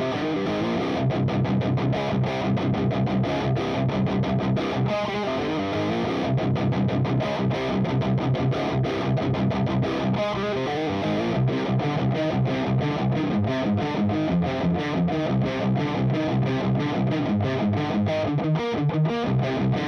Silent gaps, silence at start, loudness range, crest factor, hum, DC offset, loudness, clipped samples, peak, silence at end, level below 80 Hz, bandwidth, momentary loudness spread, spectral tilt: none; 0 s; 1 LU; 10 dB; none; under 0.1%; -24 LUFS; under 0.1%; -14 dBFS; 0 s; -48 dBFS; 6.6 kHz; 2 LU; -8 dB/octave